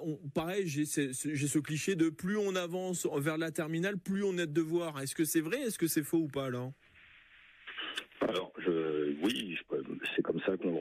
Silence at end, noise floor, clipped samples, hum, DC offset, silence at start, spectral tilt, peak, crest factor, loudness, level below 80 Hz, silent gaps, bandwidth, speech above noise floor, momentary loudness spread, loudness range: 0 s; -60 dBFS; under 0.1%; none; under 0.1%; 0 s; -4.5 dB/octave; -20 dBFS; 16 dB; -34 LUFS; -72 dBFS; none; 15.5 kHz; 27 dB; 6 LU; 3 LU